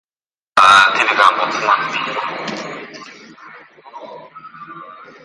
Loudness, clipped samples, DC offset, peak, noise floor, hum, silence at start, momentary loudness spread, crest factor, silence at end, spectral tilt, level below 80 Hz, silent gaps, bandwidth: -13 LUFS; under 0.1%; under 0.1%; 0 dBFS; under -90 dBFS; none; 0.55 s; 26 LU; 18 dB; 0.2 s; -1.5 dB/octave; -62 dBFS; none; 11.5 kHz